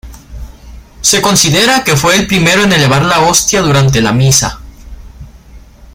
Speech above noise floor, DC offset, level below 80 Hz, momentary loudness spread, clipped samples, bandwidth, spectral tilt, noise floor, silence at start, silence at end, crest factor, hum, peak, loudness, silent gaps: 27 dB; under 0.1%; -32 dBFS; 2 LU; under 0.1%; 19.5 kHz; -3.5 dB/octave; -35 dBFS; 0.05 s; 0.35 s; 10 dB; none; 0 dBFS; -8 LUFS; none